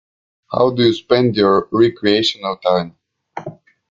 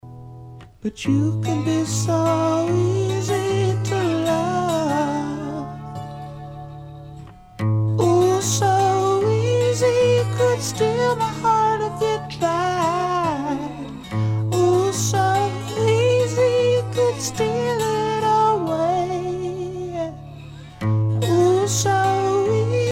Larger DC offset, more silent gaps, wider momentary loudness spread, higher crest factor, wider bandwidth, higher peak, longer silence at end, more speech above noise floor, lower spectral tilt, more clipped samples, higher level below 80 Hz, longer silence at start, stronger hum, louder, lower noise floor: neither; neither; first, 18 LU vs 15 LU; about the same, 16 dB vs 14 dB; second, 7.6 kHz vs 16 kHz; first, 0 dBFS vs -6 dBFS; first, 0.4 s vs 0 s; about the same, 20 dB vs 20 dB; about the same, -6 dB/octave vs -5.5 dB/octave; neither; about the same, -54 dBFS vs -50 dBFS; first, 0.5 s vs 0.05 s; neither; first, -16 LUFS vs -20 LUFS; second, -35 dBFS vs -40 dBFS